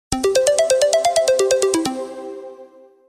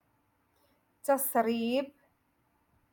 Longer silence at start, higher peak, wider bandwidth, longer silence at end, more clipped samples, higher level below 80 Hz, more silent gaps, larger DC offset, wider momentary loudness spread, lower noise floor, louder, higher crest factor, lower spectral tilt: second, 0.1 s vs 1.05 s; first, -2 dBFS vs -14 dBFS; about the same, 16 kHz vs 17.5 kHz; second, 0.45 s vs 1.05 s; neither; first, -46 dBFS vs -78 dBFS; neither; neither; first, 16 LU vs 11 LU; second, -44 dBFS vs -73 dBFS; first, -17 LUFS vs -30 LUFS; about the same, 16 dB vs 20 dB; about the same, -2.5 dB/octave vs -3.5 dB/octave